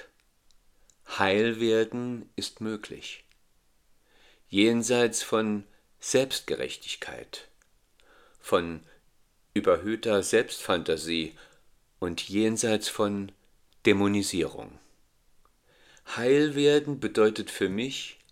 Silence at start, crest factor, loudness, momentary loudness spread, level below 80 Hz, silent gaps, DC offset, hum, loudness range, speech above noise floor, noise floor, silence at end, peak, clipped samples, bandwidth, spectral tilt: 1.1 s; 22 dB; -27 LUFS; 15 LU; -64 dBFS; none; under 0.1%; none; 4 LU; 38 dB; -65 dBFS; 0.2 s; -6 dBFS; under 0.1%; 16 kHz; -4 dB/octave